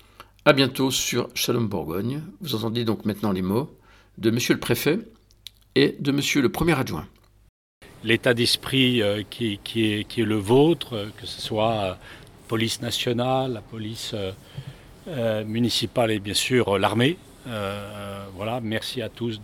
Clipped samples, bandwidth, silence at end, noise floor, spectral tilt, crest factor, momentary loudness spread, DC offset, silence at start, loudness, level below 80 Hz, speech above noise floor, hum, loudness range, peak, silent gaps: under 0.1%; 17.5 kHz; 0 s; -48 dBFS; -4.5 dB/octave; 24 dB; 14 LU; under 0.1%; 0.2 s; -24 LUFS; -52 dBFS; 25 dB; none; 4 LU; 0 dBFS; 7.49-7.81 s